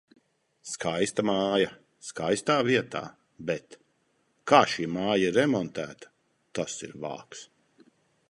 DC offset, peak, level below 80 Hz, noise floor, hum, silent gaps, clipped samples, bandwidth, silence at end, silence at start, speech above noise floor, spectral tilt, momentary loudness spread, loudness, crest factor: under 0.1%; -4 dBFS; -66 dBFS; -71 dBFS; none; none; under 0.1%; 11.5 kHz; 0.85 s; 0.65 s; 44 dB; -4.5 dB/octave; 19 LU; -27 LUFS; 26 dB